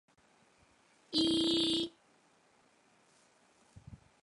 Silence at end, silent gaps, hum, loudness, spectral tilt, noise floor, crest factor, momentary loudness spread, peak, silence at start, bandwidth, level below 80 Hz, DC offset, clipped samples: 0.3 s; none; none; -32 LUFS; -3.5 dB/octave; -69 dBFS; 20 dB; 24 LU; -20 dBFS; 1.1 s; 11.5 kHz; -68 dBFS; under 0.1%; under 0.1%